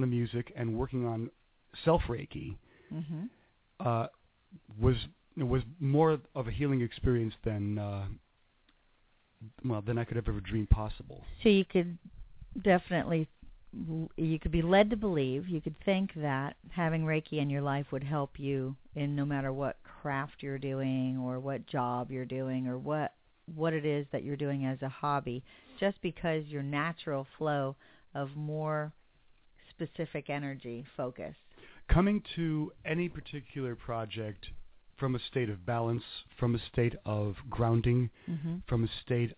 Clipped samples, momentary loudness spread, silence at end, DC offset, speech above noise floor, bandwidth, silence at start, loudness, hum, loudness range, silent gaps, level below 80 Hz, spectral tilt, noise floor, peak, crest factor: under 0.1%; 14 LU; 0.05 s; under 0.1%; 36 dB; 4 kHz; 0 s; -34 LUFS; none; 6 LU; none; -46 dBFS; -6.5 dB/octave; -69 dBFS; -10 dBFS; 24 dB